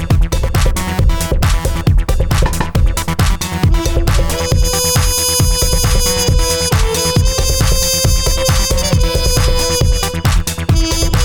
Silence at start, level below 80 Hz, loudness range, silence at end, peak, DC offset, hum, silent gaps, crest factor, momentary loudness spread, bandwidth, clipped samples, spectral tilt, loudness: 0 s; -16 dBFS; 3 LU; 0 s; -2 dBFS; under 0.1%; none; none; 10 dB; 4 LU; 19.5 kHz; under 0.1%; -4 dB/octave; -14 LUFS